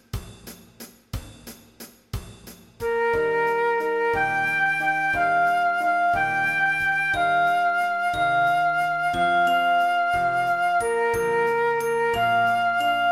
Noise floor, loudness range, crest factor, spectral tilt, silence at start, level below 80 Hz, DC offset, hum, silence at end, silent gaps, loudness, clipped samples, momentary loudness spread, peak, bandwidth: -46 dBFS; 5 LU; 12 dB; -4 dB/octave; 0.15 s; -48 dBFS; under 0.1%; none; 0 s; none; -22 LUFS; under 0.1%; 16 LU; -12 dBFS; 16 kHz